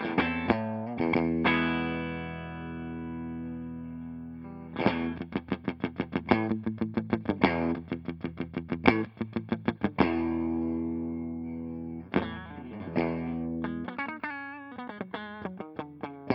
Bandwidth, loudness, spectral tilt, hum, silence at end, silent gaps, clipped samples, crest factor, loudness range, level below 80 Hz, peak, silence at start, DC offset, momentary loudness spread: 5.8 kHz; -32 LUFS; -9 dB/octave; none; 0 s; none; under 0.1%; 30 dB; 6 LU; -56 dBFS; -2 dBFS; 0 s; under 0.1%; 14 LU